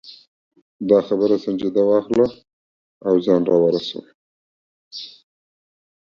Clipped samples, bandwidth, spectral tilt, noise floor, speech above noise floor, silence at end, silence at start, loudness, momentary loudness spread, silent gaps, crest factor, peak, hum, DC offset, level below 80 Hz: under 0.1%; 7.2 kHz; -7.5 dB/octave; under -90 dBFS; over 72 dB; 0.95 s; 0.05 s; -19 LUFS; 18 LU; 0.27-0.51 s, 0.62-0.79 s, 2.53-3.01 s, 4.14-4.91 s; 20 dB; -2 dBFS; none; under 0.1%; -62 dBFS